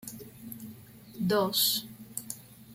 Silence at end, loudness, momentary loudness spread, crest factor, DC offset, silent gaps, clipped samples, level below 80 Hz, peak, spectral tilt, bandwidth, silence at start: 0 s; -29 LUFS; 21 LU; 20 dB; under 0.1%; none; under 0.1%; -68 dBFS; -14 dBFS; -3 dB/octave; 16.5 kHz; 0 s